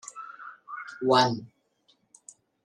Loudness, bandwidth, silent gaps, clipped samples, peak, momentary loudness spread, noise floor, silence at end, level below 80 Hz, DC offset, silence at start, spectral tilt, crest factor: -25 LUFS; 12 kHz; none; under 0.1%; -6 dBFS; 20 LU; -68 dBFS; 1.2 s; -76 dBFS; under 0.1%; 0.05 s; -4.5 dB/octave; 24 dB